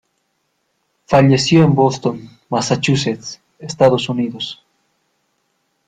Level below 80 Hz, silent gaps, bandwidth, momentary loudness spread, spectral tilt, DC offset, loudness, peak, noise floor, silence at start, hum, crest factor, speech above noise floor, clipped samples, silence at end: -52 dBFS; none; 9.4 kHz; 19 LU; -5.5 dB/octave; under 0.1%; -16 LUFS; -2 dBFS; -68 dBFS; 1.1 s; none; 16 dB; 53 dB; under 0.1%; 1.35 s